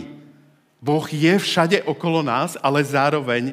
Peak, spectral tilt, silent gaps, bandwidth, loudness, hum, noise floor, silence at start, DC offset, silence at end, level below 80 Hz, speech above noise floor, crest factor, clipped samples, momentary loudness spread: 0 dBFS; -5.5 dB/octave; none; 16 kHz; -20 LUFS; none; -54 dBFS; 0 s; under 0.1%; 0 s; -74 dBFS; 35 dB; 20 dB; under 0.1%; 5 LU